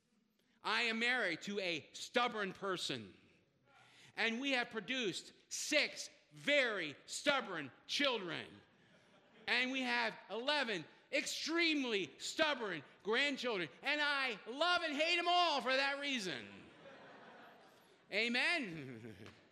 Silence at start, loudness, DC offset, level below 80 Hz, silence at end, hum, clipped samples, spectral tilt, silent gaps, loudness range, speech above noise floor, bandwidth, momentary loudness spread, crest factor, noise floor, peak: 0.65 s; -37 LUFS; under 0.1%; -86 dBFS; 0.2 s; none; under 0.1%; -2.5 dB/octave; none; 5 LU; 39 dB; 14 kHz; 15 LU; 22 dB; -77 dBFS; -16 dBFS